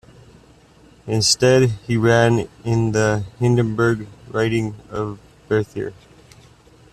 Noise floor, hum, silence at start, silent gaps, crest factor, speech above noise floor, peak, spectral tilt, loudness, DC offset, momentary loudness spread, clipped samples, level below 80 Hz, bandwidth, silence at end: -49 dBFS; none; 1.05 s; none; 18 dB; 31 dB; -2 dBFS; -5 dB/octave; -19 LUFS; under 0.1%; 13 LU; under 0.1%; -48 dBFS; 13 kHz; 1 s